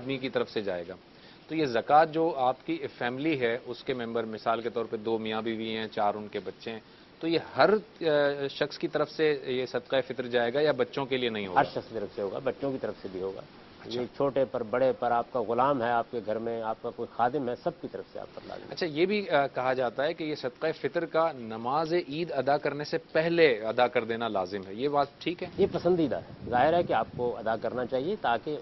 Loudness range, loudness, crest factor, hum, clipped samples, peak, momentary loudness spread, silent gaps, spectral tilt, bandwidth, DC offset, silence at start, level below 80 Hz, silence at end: 4 LU; -29 LUFS; 22 dB; none; under 0.1%; -8 dBFS; 11 LU; none; -7 dB/octave; 6 kHz; under 0.1%; 0 s; -64 dBFS; 0 s